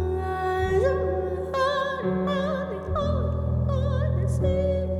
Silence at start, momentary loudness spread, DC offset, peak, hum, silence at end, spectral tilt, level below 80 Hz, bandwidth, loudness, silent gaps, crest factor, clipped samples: 0 s; 5 LU; under 0.1%; -12 dBFS; none; 0 s; -7.5 dB/octave; -34 dBFS; 11.5 kHz; -25 LUFS; none; 12 dB; under 0.1%